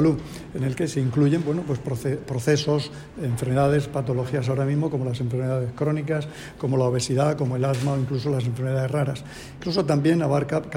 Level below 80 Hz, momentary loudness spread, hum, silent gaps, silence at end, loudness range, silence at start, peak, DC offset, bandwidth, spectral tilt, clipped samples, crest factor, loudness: -50 dBFS; 8 LU; none; none; 0 s; 1 LU; 0 s; -8 dBFS; under 0.1%; 15.5 kHz; -7 dB/octave; under 0.1%; 16 dB; -24 LUFS